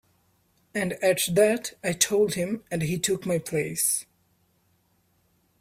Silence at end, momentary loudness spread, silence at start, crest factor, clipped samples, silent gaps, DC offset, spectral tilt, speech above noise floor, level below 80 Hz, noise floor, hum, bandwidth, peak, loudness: 1.6 s; 8 LU; 0.75 s; 22 dB; under 0.1%; none; under 0.1%; -3.5 dB/octave; 43 dB; -62 dBFS; -68 dBFS; none; 16 kHz; -6 dBFS; -25 LUFS